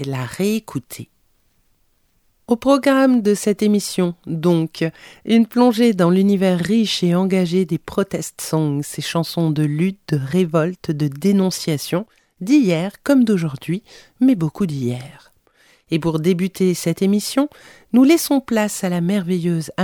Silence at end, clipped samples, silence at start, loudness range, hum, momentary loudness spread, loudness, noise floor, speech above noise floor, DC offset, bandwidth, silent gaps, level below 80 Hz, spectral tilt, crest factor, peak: 0 s; under 0.1%; 0 s; 4 LU; none; 10 LU; -18 LUFS; -62 dBFS; 44 dB; under 0.1%; 19.5 kHz; none; -56 dBFS; -6 dB/octave; 16 dB; -2 dBFS